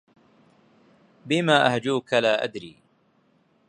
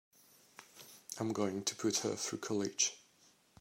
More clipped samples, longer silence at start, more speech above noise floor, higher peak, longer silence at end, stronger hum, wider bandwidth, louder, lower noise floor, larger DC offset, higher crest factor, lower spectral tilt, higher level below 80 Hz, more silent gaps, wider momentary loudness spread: neither; first, 1.25 s vs 0.6 s; first, 42 dB vs 32 dB; first, -4 dBFS vs -18 dBFS; first, 1 s vs 0.6 s; neither; second, 11 kHz vs 16 kHz; first, -22 LUFS vs -36 LUFS; second, -64 dBFS vs -68 dBFS; neither; about the same, 24 dB vs 20 dB; first, -5 dB/octave vs -3 dB/octave; first, -70 dBFS vs -84 dBFS; neither; second, 16 LU vs 21 LU